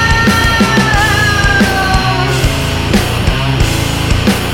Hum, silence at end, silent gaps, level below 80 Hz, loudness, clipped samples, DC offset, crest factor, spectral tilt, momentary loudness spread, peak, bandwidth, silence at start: none; 0 s; none; -20 dBFS; -11 LUFS; under 0.1%; under 0.1%; 10 dB; -4.5 dB/octave; 4 LU; 0 dBFS; 17.5 kHz; 0 s